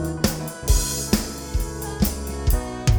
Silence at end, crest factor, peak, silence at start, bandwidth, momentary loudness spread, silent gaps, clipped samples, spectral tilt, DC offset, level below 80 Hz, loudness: 0 s; 18 dB; -4 dBFS; 0 s; over 20 kHz; 7 LU; none; under 0.1%; -4.5 dB/octave; under 0.1%; -26 dBFS; -24 LUFS